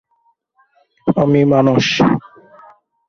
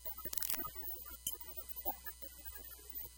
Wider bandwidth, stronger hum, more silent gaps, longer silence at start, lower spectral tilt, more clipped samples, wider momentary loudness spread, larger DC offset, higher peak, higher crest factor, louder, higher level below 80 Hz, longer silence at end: second, 7.2 kHz vs 17.5 kHz; neither; neither; first, 1.05 s vs 0 s; first, -6.5 dB/octave vs -1.5 dB/octave; neither; about the same, 9 LU vs 11 LU; neither; first, 0 dBFS vs -16 dBFS; second, 16 dB vs 30 dB; first, -14 LUFS vs -41 LUFS; first, -50 dBFS vs -60 dBFS; first, 0.9 s vs 0 s